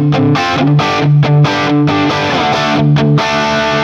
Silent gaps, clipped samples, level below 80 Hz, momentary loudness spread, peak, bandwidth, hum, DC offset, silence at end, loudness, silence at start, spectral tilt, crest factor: none; under 0.1%; -42 dBFS; 2 LU; 0 dBFS; 7.4 kHz; none; under 0.1%; 0 s; -11 LUFS; 0 s; -6.5 dB/octave; 10 dB